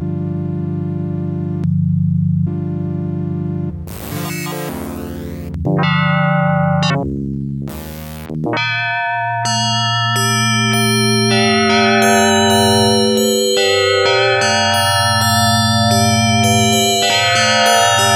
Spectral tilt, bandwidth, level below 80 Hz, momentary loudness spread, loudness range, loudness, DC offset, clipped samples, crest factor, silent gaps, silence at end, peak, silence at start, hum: -4 dB/octave; 17 kHz; -42 dBFS; 13 LU; 8 LU; -14 LUFS; under 0.1%; under 0.1%; 14 dB; none; 0 s; 0 dBFS; 0 s; none